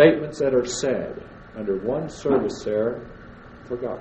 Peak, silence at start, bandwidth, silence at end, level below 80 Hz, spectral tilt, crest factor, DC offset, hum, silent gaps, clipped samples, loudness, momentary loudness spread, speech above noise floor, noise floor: -2 dBFS; 0 s; 8.6 kHz; 0 s; -50 dBFS; -5.5 dB/octave; 22 dB; under 0.1%; none; none; under 0.1%; -24 LUFS; 19 LU; 21 dB; -43 dBFS